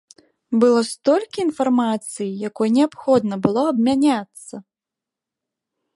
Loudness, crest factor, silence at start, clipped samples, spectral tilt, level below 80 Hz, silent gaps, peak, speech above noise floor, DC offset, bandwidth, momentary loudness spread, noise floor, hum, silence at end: -19 LUFS; 18 dB; 0.5 s; under 0.1%; -5.5 dB/octave; -62 dBFS; none; -2 dBFS; 68 dB; under 0.1%; 11.5 kHz; 10 LU; -87 dBFS; none; 1.35 s